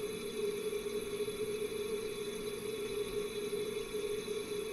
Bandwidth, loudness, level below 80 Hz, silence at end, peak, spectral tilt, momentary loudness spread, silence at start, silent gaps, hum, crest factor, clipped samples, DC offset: 15.5 kHz; -39 LUFS; -60 dBFS; 0 s; -26 dBFS; -3.5 dB/octave; 2 LU; 0 s; none; none; 12 dB; under 0.1%; under 0.1%